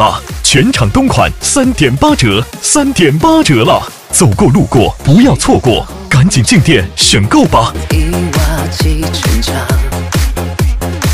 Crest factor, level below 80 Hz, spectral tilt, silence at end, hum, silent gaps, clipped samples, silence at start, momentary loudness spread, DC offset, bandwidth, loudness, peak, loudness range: 10 dB; -20 dBFS; -4.5 dB/octave; 0 s; none; none; 0.5%; 0 s; 7 LU; 0.8%; 16.5 kHz; -9 LUFS; 0 dBFS; 4 LU